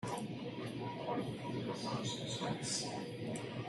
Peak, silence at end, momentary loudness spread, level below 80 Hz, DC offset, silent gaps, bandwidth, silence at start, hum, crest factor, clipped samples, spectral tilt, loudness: -26 dBFS; 0 s; 5 LU; -70 dBFS; under 0.1%; none; 12 kHz; 0 s; none; 16 dB; under 0.1%; -4.5 dB/octave; -41 LUFS